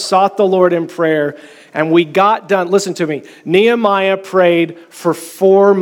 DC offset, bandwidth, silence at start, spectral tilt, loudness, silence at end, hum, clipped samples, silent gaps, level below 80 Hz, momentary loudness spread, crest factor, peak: under 0.1%; 17 kHz; 0 s; -5.5 dB/octave; -13 LUFS; 0 s; none; under 0.1%; none; -68 dBFS; 9 LU; 12 dB; 0 dBFS